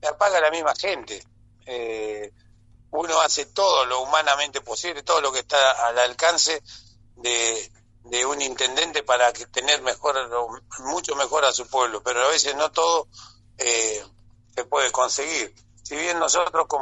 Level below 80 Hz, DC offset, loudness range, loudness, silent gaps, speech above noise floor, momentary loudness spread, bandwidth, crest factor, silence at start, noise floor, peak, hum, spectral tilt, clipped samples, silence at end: -58 dBFS; under 0.1%; 4 LU; -22 LUFS; none; 30 dB; 13 LU; 8.4 kHz; 18 dB; 0.05 s; -53 dBFS; -4 dBFS; none; 0 dB/octave; under 0.1%; 0 s